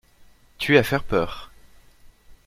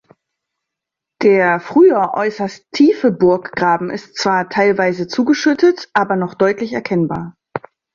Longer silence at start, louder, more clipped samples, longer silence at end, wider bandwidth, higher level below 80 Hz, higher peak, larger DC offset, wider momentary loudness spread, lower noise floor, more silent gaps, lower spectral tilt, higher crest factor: second, 0.6 s vs 1.2 s; second, -22 LUFS vs -15 LUFS; neither; second, 0.1 s vs 0.35 s; first, 16 kHz vs 7.4 kHz; first, -44 dBFS vs -56 dBFS; about the same, -2 dBFS vs -2 dBFS; neither; about the same, 13 LU vs 12 LU; second, -52 dBFS vs -83 dBFS; neither; about the same, -5.5 dB/octave vs -6 dB/octave; first, 24 dB vs 14 dB